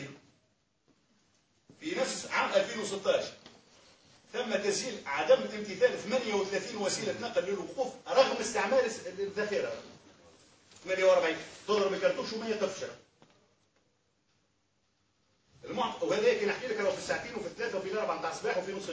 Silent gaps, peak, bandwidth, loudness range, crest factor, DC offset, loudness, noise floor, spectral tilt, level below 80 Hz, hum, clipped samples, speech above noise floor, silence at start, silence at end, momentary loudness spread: none; -12 dBFS; 8 kHz; 5 LU; 22 dB; under 0.1%; -31 LUFS; -75 dBFS; -3 dB/octave; -72 dBFS; none; under 0.1%; 44 dB; 0 s; 0 s; 11 LU